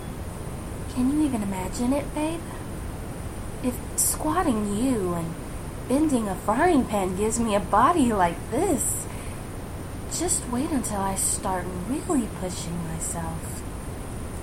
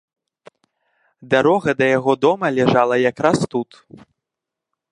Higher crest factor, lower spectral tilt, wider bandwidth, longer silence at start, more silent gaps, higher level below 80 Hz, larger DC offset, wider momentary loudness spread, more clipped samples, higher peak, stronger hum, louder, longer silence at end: about the same, 18 dB vs 18 dB; second, -4.5 dB/octave vs -6 dB/octave; first, 16.5 kHz vs 11 kHz; second, 0 s vs 1.2 s; neither; first, -38 dBFS vs -58 dBFS; neither; first, 14 LU vs 7 LU; neither; second, -8 dBFS vs 0 dBFS; neither; second, -26 LUFS vs -17 LUFS; second, 0 s vs 1.3 s